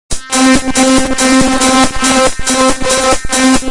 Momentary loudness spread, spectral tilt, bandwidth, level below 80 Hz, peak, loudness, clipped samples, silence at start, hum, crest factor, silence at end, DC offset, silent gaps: 2 LU; -2.5 dB/octave; 11.5 kHz; -26 dBFS; 0 dBFS; -10 LUFS; under 0.1%; 0.1 s; none; 10 dB; 0 s; under 0.1%; none